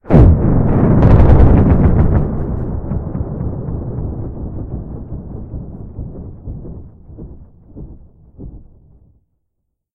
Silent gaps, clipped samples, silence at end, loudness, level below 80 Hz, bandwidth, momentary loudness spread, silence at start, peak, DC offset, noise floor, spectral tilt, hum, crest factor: none; 0.3%; 1.35 s; -14 LUFS; -20 dBFS; 3.9 kHz; 26 LU; 0.05 s; 0 dBFS; under 0.1%; -72 dBFS; -11.5 dB/octave; none; 14 dB